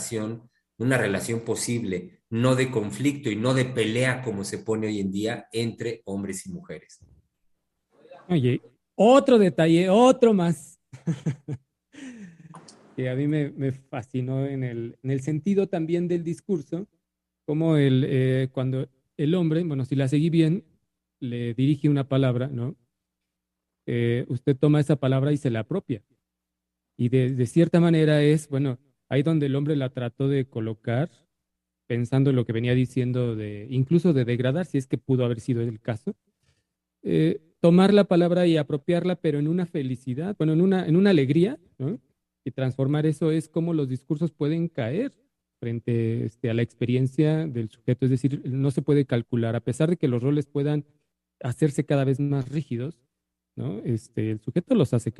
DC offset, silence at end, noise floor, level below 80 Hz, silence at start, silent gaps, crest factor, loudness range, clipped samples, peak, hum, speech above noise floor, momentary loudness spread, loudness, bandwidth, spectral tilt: under 0.1%; 0.05 s; -84 dBFS; -64 dBFS; 0 s; none; 18 dB; 6 LU; under 0.1%; -6 dBFS; none; 61 dB; 13 LU; -24 LUFS; 12 kHz; -7 dB/octave